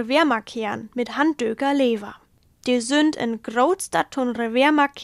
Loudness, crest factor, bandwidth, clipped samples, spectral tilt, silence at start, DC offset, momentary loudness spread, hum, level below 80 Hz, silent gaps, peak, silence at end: -22 LUFS; 16 dB; 13.5 kHz; under 0.1%; -3.5 dB/octave; 0 s; under 0.1%; 10 LU; none; -62 dBFS; none; -6 dBFS; 0 s